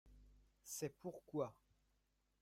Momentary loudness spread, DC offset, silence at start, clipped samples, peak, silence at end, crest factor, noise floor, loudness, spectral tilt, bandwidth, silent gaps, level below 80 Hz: 8 LU; under 0.1%; 0.05 s; under 0.1%; -30 dBFS; 0.9 s; 22 dB; -83 dBFS; -48 LUFS; -5 dB/octave; 16 kHz; none; -74 dBFS